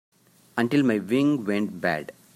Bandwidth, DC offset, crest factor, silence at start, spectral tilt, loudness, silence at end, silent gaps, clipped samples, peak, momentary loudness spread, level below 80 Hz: 14.5 kHz; under 0.1%; 18 dB; 0.55 s; -6.5 dB/octave; -25 LUFS; 0.25 s; none; under 0.1%; -8 dBFS; 7 LU; -70 dBFS